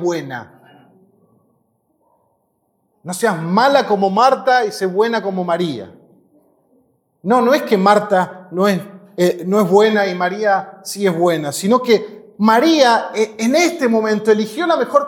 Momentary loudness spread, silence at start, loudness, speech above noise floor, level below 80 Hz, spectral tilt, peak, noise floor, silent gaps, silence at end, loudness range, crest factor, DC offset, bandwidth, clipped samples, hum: 11 LU; 0 s; -15 LUFS; 50 dB; -70 dBFS; -5 dB/octave; 0 dBFS; -65 dBFS; none; 0 s; 5 LU; 16 dB; under 0.1%; 17.5 kHz; under 0.1%; none